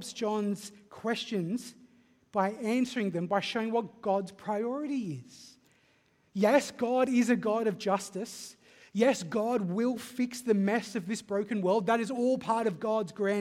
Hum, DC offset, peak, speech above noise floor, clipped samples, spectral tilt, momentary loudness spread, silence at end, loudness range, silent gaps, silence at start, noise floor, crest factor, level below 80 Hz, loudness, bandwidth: none; under 0.1%; -10 dBFS; 38 dB; under 0.1%; -5.5 dB/octave; 12 LU; 0 s; 3 LU; none; 0 s; -68 dBFS; 20 dB; -76 dBFS; -31 LUFS; 15.5 kHz